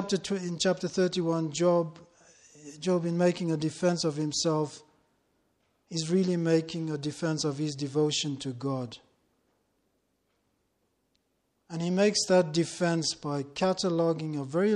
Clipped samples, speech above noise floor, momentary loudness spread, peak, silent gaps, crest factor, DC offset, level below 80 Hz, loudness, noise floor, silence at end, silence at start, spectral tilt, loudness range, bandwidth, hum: under 0.1%; 47 dB; 9 LU; -12 dBFS; none; 18 dB; under 0.1%; -70 dBFS; -29 LUFS; -76 dBFS; 0 s; 0 s; -5 dB/octave; 7 LU; 11 kHz; none